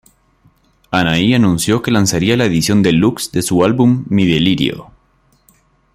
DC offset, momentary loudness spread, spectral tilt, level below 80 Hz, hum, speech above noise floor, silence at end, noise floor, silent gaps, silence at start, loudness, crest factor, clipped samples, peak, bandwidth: under 0.1%; 5 LU; -5 dB/octave; -44 dBFS; none; 43 dB; 1.1 s; -56 dBFS; none; 0.9 s; -13 LUFS; 14 dB; under 0.1%; 0 dBFS; 15.5 kHz